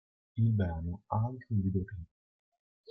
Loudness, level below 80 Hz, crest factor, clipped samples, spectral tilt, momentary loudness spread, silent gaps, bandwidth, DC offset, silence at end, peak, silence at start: -34 LUFS; -56 dBFS; 16 dB; under 0.1%; -12 dB/octave; 14 LU; none; 3.6 kHz; under 0.1%; 0.85 s; -18 dBFS; 0.35 s